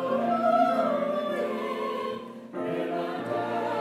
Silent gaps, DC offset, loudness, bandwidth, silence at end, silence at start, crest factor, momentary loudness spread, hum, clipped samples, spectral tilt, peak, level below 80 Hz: none; under 0.1%; -28 LUFS; 14.5 kHz; 0 s; 0 s; 16 dB; 11 LU; none; under 0.1%; -6.5 dB/octave; -12 dBFS; -76 dBFS